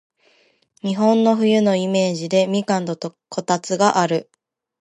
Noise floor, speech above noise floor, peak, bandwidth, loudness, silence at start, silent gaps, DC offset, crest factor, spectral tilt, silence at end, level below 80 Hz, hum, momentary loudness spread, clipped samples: -59 dBFS; 41 dB; -2 dBFS; 11 kHz; -19 LUFS; 0.85 s; none; under 0.1%; 18 dB; -5.5 dB/octave; 0.6 s; -70 dBFS; none; 12 LU; under 0.1%